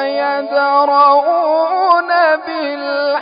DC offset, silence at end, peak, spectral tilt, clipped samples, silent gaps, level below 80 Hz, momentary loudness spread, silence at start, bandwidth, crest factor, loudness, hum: under 0.1%; 0 s; -2 dBFS; -7.5 dB/octave; under 0.1%; none; -66 dBFS; 8 LU; 0 s; 5.2 kHz; 12 dB; -13 LUFS; none